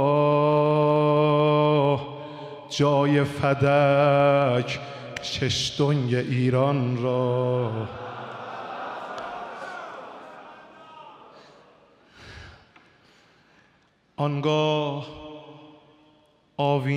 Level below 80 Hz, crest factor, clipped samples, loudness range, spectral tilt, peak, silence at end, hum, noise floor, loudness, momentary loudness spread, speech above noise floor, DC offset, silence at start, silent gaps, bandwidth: -60 dBFS; 16 dB; under 0.1%; 17 LU; -6.5 dB/octave; -10 dBFS; 0 s; none; -63 dBFS; -23 LUFS; 20 LU; 40 dB; under 0.1%; 0 s; none; 10.5 kHz